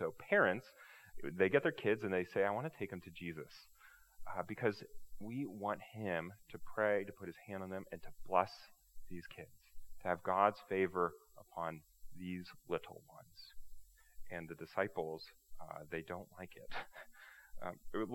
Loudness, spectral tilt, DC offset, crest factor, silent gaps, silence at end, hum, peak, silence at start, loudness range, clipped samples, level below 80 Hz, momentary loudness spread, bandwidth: -40 LUFS; -6.5 dB/octave; under 0.1%; 26 dB; none; 0 s; none; -16 dBFS; 0 s; 8 LU; under 0.1%; -64 dBFS; 23 LU; 17.5 kHz